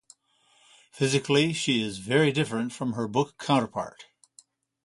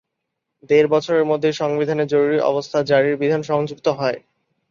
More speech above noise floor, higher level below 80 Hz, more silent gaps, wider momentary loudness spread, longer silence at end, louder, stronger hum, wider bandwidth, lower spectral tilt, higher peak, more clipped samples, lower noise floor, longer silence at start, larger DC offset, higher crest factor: second, 39 dB vs 60 dB; about the same, -64 dBFS vs -64 dBFS; neither; about the same, 8 LU vs 6 LU; first, 0.85 s vs 0.55 s; second, -26 LUFS vs -19 LUFS; neither; first, 11.5 kHz vs 7.4 kHz; about the same, -5 dB/octave vs -6 dB/octave; second, -8 dBFS vs -4 dBFS; neither; second, -65 dBFS vs -78 dBFS; first, 0.95 s vs 0.7 s; neither; about the same, 20 dB vs 16 dB